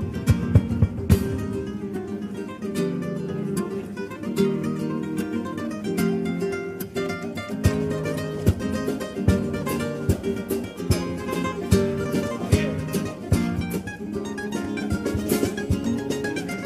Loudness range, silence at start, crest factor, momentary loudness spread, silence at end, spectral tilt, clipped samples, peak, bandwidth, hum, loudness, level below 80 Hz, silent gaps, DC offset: 3 LU; 0 s; 22 dB; 8 LU; 0 s; -6.5 dB/octave; under 0.1%; -2 dBFS; 15.5 kHz; none; -26 LUFS; -38 dBFS; none; under 0.1%